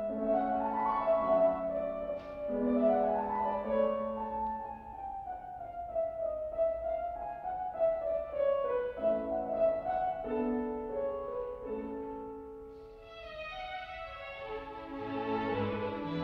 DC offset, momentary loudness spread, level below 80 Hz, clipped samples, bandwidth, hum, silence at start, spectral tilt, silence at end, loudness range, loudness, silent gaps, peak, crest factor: under 0.1%; 13 LU; -58 dBFS; under 0.1%; 5.6 kHz; none; 0 s; -8.5 dB/octave; 0 s; 10 LU; -34 LUFS; none; -18 dBFS; 16 dB